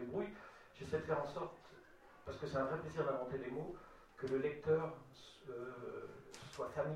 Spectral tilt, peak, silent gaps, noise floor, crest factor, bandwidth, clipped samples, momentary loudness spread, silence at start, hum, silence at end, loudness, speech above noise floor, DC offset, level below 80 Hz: -6.5 dB/octave; -24 dBFS; none; -62 dBFS; 20 dB; 12.5 kHz; under 0.1%; 19 LU; 0 s; none; 0 s; -43 LUFS; 20 dB; under 0.1%; -68 dBFS